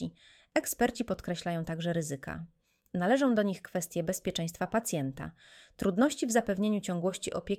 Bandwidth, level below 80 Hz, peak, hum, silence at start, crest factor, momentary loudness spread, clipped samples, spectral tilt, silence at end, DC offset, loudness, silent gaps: 16.5 kHz; -60 dBFS; -12 dBFS; none; 0 s; 20 dB; 12 LU; under 0.1%; -5 dB/octave; 0 s; under 0.1%; -32 LUFS; none